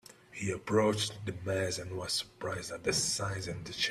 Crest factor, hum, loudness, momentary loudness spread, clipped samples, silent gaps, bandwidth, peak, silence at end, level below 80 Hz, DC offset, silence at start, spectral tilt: 20 dB; none; -33 LUFS; 10 LU; under 0.1%; none; 14.5 kHz; -14 dBFS; 0 s; -62 dBFS; under 0.1%; 0.1 s; -3.5 dB/octave